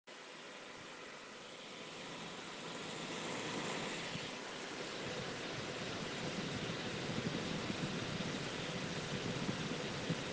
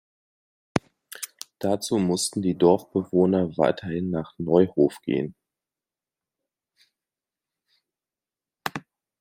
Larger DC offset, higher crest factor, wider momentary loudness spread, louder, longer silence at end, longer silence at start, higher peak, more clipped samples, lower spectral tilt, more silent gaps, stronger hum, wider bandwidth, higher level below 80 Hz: neither; second, 18 dB vs 24 dB; second, 10 LU vs 15 LU; second, -42 LUFS vs -24 LUFS; second, 0 s vs 0.4 s; second, 0.05 s vs 0.75 s; second, -26 dBFS vs -2 dBFS; neither; second, -4 dB/octave vs -5.5 dB/octave; neither; neither; second, 10.5 kHz vs 16.5 kHz; second, -68 dBFS vs -62 dBFS